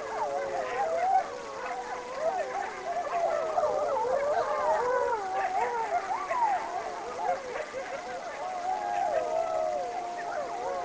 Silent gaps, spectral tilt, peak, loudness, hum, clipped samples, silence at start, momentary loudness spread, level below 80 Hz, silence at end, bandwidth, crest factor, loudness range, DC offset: none; -3 dB/octave; -16 dBFS; -31 LUFS; none; under 0.1%; 0 s; 8 LU; -64 dBFS; 0 s; 8 kHz; 16 dB; 4 LU; under 0.1%